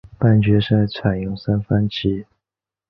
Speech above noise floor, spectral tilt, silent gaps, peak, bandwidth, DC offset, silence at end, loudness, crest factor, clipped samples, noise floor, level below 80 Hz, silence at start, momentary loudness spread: 70 dB; -9.5 dB/octave; none; -2 dBFS; 5.8 kHz; under 0.1%; 0.65 s; -19 LUFS; 16 dB; under 0.1%; -88 dBFS; -42 dBFS; 0.2 s; 8 LU